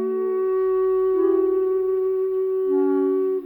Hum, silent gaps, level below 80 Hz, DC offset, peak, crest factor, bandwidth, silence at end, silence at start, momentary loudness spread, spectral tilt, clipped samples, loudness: none; none; -60 dBFS; under 0.1%; -10 dBFS; 10 dB; 2.9 kHz; 0 s; 0 s; 3 LU; -9 dB/octave; under 0.1%; -21 LUFS